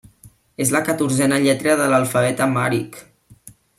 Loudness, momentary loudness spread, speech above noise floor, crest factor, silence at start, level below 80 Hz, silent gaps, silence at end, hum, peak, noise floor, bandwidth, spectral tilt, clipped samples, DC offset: -18 LUFS; 6 LU; 31 dB; 18 dB; 0.25 s; -58 dBFS; none; 0.3 s; none; -2 dBFS; -49 dBFS; 16 kHz; -4.5 dB/octave; under 0.1%; under 0.1%